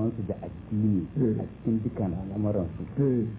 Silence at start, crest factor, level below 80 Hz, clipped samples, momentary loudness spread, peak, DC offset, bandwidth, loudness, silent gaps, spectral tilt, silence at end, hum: 0 s; 14 dB; -46 dBFS; under 0.1%; 7 LU; -14 dBFS; under 0.1%; 3.8 kHz; -29 LUFS; none; -13.5 dB/octave; 0 s; none